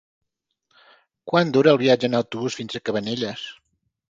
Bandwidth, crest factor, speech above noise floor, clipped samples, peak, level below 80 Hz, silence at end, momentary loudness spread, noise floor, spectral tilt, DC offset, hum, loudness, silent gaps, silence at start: 7.8 kHz; 22 dB; 52 dB; under 0.1%; -2 dBFS; -66 dBFS; 0.55 s; 15 LU; -73 dBFS; -5.5 dB/octave; under 0.1%; none; -21 LUFS; none; 1.25 s